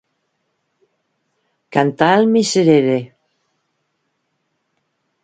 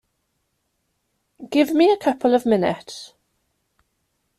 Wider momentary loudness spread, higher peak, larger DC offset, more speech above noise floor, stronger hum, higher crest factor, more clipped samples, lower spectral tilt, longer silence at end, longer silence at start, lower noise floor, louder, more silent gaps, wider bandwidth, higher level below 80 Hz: second, 9 LU vs 17 LU; first, 0 dBFS vs -4 dBFS; neither; about the same, 57 dB vs 54 dB; neither; about the same, 20 dB vs 18 dB; neither; about the same, -5.5 dB/octave vs -5.5 dB/octave; first, 2.15 s vs 1.35 s; first, 1.7 s vs 1.4 s; about the same, -70 dBFS vs -73 dBFS; first, -15 LUFS vs -19 LUFS; neither; second, 9.4 kHz vs 14.5 kHz; about the same, -62 dBFS vs -64 dBFS